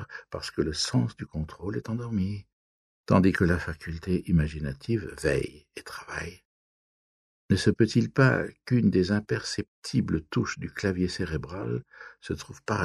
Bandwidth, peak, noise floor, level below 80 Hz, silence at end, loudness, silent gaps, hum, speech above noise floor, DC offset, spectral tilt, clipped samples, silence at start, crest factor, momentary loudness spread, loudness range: 12.5 kHz; -6 dBFS; under -90 dBFS; -46 dBFS; 0 s; -28 LUFS; 2.53-3.04 s, 6.45-7.49 s, 9.68-9.82 s; none; over 63 dB; under 0.1%; -6 dB/octave; under 0.1%; 0 s; 22 dB; 14 LU; 5 LU